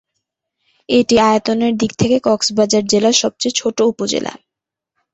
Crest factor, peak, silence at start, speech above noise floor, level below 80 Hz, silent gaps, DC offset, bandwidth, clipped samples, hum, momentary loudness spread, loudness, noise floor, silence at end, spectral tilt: 16 dB; -2 dBFS; 0.9 s; 69 dB; -50 dBFS; none; under 0.1%; 8.2 kHz; under 0.1%; none; 6 LU; -15 LUFS; -84 dBFS; 0.75 s; -3.5 dB/octave